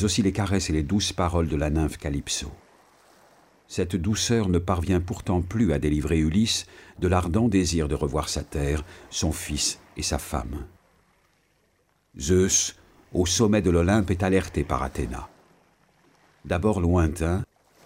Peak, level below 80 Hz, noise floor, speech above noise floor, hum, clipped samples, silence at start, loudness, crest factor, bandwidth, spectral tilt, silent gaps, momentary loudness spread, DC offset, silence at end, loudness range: -8 dBFS; -38 dBFS; -67 dBFS; 43 dB; none; under 0.1%; 0 s; -25 LUFS; 18 dB; 16 kHz; -5 dB/octave; none; 10 LU; under 0.1%; 0.4 s; 5 LU